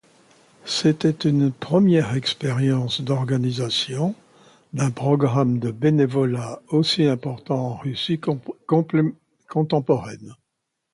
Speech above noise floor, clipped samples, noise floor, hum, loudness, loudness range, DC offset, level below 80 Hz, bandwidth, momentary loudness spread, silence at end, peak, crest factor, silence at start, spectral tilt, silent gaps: 57 dB; under 0.1%; -78 dBFS; none; -22 LUFS; 3 LU; under 0.1%; -60 dBFS; 11.5 kHz; 8 LU; 0.6 s; -6 dBFS; 16 dB; 0.65 s; -6.5 dB/octave; none